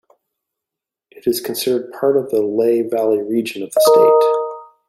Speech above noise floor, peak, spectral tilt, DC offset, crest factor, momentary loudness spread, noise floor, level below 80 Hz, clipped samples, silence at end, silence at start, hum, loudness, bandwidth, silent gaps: 70 dB; -2 dBFS; -4.5 dB/octave; under 0.1%; 16 dB; 10 LU; -85 dBFS; -68 dBFS; under 0.1%; 0.25 s; 1.25 s; none; -16 LUFS; 16 kHz; none